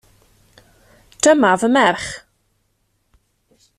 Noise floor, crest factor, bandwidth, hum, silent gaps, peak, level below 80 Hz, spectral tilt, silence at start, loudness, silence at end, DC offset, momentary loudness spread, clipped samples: -66 dBFS; 18 dB; 14 kHz; none; none; -2 dBFS; -56 dBFS; -3.5 dB/octave; 1.25 s; -15 LUFS; 1.6 s; under 0.1%; 16 LU; under 0.1%